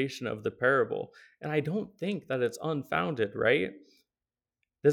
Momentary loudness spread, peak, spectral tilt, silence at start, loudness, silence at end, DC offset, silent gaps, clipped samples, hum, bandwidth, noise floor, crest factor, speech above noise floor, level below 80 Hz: 10 LU; -12 dBFS; -6 dB/octave; 0 s; -30 LUFS; 0 s; under 0.1%; none; under 0.1%; none; 17 kHz; under -90 dBFS; 20 dB; over 59 dB; -70 dBFS